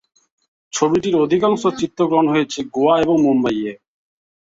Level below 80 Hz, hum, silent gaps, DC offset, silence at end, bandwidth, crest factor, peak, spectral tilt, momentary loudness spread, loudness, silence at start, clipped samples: -54 dBFS; none; none; under 0.1%; 0.75 s; 7.8 kHz; 16 dB; -2 dBFS; -5.5 dB/octave; 8 LU; -17 LUFS; 0.75 s; under 0.1%